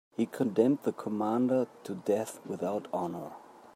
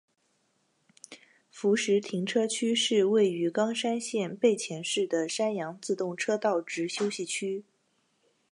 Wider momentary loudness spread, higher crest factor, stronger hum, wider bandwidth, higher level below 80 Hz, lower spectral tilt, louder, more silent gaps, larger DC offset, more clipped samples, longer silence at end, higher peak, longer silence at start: first, 11 LU vs 8 LU; about the same, 20 dB vs 18 dB; neither; first, 16 kHz vs 11 kHz; about the same, -82 dBFS vs -84 dBFS; first, -7 dB/octave vs -3.5 dB/octave; second, -31 LUFS vs -28 LUFS; neither; neither; neither; second, 0.05 s vs 0.9 s; about the same, -12 dBFS vs -12 dBFS; second, 0.2 s vs 1.1 s